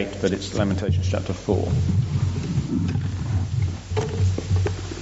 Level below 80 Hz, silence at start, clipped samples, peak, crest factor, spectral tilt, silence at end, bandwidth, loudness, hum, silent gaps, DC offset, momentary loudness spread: -38 dBFS; 0 s; under 0.1%; -6 dBFS; 16 dB; -7.5 dB/octave; 0 s; 8 kHz; -24 LUFS; none; none; under 0.1%; 4 LU